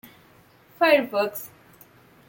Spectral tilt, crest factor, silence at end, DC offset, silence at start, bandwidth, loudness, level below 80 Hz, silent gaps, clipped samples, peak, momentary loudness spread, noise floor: -3.5 dB/octave; 22 dB; 0.8 s; under 0.1%; 0.8 s; 17 kHz; -22 LUFS; -72 dBFS; none; under 0.1%; -6 dBFS; 18 LU; -55 dBFS